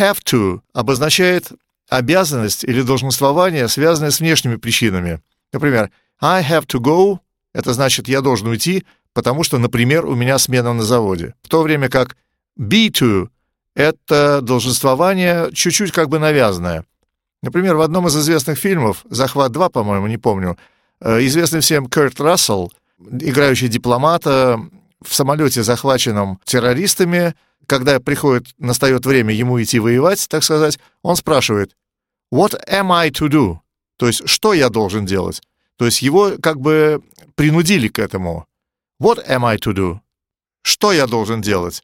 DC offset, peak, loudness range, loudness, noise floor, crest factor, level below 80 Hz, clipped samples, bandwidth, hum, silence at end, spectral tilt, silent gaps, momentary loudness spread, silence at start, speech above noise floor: under 0.1%; 0 dBFS; 2 LU; -15 LUFS; -86 dBFS; 16 dB; -46 dBFS; under 0.1%; 17 kHz; none; 0.05 s; -4.5 dB/octave; none; 9 LU; 0 s; 71 dB